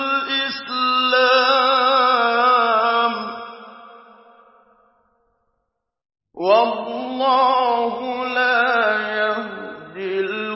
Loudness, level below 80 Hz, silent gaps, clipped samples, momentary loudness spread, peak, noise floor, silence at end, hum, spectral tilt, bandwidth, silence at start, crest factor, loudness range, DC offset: -18 LUFS; -70 dBFS; none; under 0.1%; 12 LU; -4 dBFS; -76 dBFS; 0 s; none; -6.5 dB/octave; 5.8 kHz; 0 s; 16 dB; 9 LU; under 0.1%